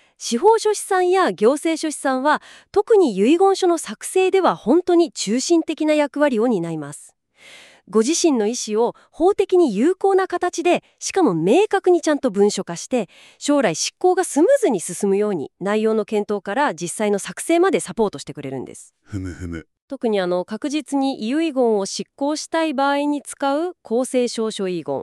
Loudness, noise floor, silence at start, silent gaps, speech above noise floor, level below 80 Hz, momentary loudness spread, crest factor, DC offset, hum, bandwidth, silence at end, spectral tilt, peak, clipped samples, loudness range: -19 LUFS; -46 dBFS; 0.2 s; 19.82-19.88 s; 27 dB; -58 dBFS; 9 LU; 16 dB; under 0.1%; none; 13 kHz; 0 s; -4.5 dB/octave; -4 dBFS; under 0.1%; 5 LU